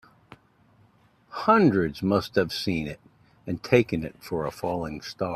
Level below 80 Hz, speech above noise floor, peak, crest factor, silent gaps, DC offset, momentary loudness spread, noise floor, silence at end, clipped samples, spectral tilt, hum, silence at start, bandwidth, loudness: -54 dBFS; 36 dB; -6 dBFS; 22 dB; none; under 0.1%; 16 LU; -60 dBFS; 0 s; under 0.1%; -6.5 dB/octave; none; 1.3 s; 15 kHz; -25 LUFS